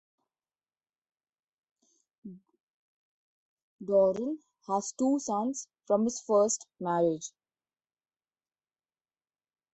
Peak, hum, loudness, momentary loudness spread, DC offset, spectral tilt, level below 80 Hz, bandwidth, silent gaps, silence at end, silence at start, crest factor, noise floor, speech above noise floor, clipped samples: -14 dBFS; none; -29 LUFS; 18 LU; under 0.1%; -5 dB/octave; -76 dBFS; 8.4 kHz; 2.61-3.79 s; 2.45 s; 2.25 s; 20 dB; under -90 dBFS; over 61 dB; under 0.1%